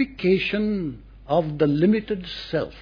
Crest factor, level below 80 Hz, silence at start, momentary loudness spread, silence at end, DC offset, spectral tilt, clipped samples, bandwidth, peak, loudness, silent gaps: 16 dB; -46 dBFS; 0 s; 10 LU; 0 s; under 0.1%; -8.5 dB/octave; under 0.1%; 5.2 kHz; -8 dBFS; -23 LUFS; none